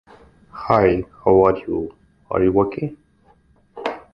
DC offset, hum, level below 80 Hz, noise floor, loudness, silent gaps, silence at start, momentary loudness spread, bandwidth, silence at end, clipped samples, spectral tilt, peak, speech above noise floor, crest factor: under 0.1%; none; -44 dBFS; -56 dBFS; -19 LUFS; none; 0.55 s; 16 LU; 5.8 kHz; 0.15 s; under 0.1%; -9.5 dB/octave; 0 dBFS; 38 dB; 20 dB